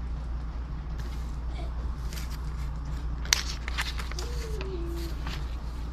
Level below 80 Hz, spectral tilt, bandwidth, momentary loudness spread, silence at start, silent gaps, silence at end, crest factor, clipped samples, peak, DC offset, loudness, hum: -34 dBFS; -3 dB/octave; 13.5 kHz; 11 LU; 0 s; none; 0 s; 32 dB; under 0.1%; 0 dBFS; under 0.1%; -34 LUFS; none